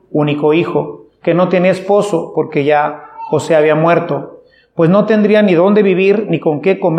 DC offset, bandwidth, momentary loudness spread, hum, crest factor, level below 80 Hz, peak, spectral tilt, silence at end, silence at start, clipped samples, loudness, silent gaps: under 0.1%; 10.5 kHz; 11 LU; none; 12 dB; -62 dBFS; 0 dBFS; -7.5 dB/octave; 0 s; 0.15 s; under 0.1%; -12 LUFS; none